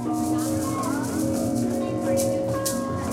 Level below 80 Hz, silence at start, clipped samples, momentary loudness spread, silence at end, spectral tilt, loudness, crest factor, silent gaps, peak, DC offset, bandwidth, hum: -50 dBFS; 0 s; under 0.1%; 2 LU; 0 s; -5.5 dB/octave; -25 LUFS; 14 dB; none; -10 dBFS; under 0.1%; 16 kHz; 60 Hz at -35 dBFS